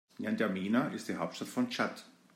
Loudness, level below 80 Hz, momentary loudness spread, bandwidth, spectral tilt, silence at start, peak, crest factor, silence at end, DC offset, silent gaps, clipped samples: -34 LUFS; -82 dBFS; 6 LU; 16 kHz; -5.5 dB/octave; 0.2 s; -18 dBFS; 18 dB; 0.25 s; under 0.1%; none; under 0.1%